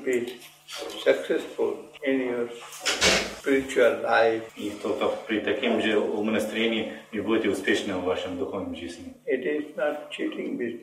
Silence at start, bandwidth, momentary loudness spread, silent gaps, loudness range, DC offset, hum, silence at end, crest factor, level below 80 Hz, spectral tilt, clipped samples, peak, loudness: 0 s; 16 kHz; 12 LU; none; 4 LU; under 0.1%; none; 0 s; 20 dB; -58 dBFS; -3 dB/octave; under 0.1%; -6 dBFS; -26 LUFS